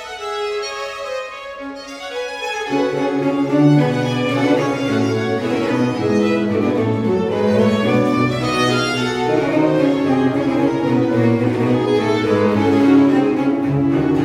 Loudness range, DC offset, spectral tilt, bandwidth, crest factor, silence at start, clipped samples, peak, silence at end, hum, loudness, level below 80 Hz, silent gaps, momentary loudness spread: 3 LU; under 0.1%; -6.5 dB/octave; 12 kHz; 14 dB; 0 s; under 0.1%; -2 dBFS; 0 s; none; -17 LUFS; -50 dBFS; none; 11 LU